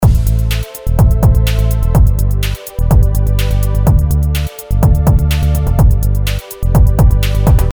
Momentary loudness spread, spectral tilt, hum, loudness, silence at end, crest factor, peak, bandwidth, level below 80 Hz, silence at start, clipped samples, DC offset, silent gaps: 7 LU; -6.5 dB/octave; none; -13 LUFS; 0 s; 10 dB; 0 dBFS; over 20 kHz; -12 dBFS; 0 s; under 0.1%; under 0.1%; none